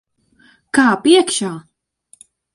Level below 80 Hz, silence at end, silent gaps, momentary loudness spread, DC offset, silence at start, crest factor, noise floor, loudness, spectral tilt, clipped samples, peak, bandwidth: -62 dBFS; 0.95 s; none; 14 LU; under 0.1%; 0.75 s; 18 dB; -54 dBFS; -15 LUFS; -3 dB/octave; under 0.1%; 0 dBFS; 11.5 kHz